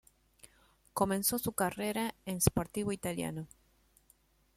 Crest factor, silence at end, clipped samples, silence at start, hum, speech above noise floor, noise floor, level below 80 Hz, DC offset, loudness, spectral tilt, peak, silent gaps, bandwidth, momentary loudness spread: 26 dB; 1.1 s; under 0.1%; 0.45 s; none; 35 dB; -69 dBFS; -56 dBFS; under 0.1%; -34 LUFS; -4.5 dB/octave; -10 dBFS; none; 16.5 kHz; 10 LU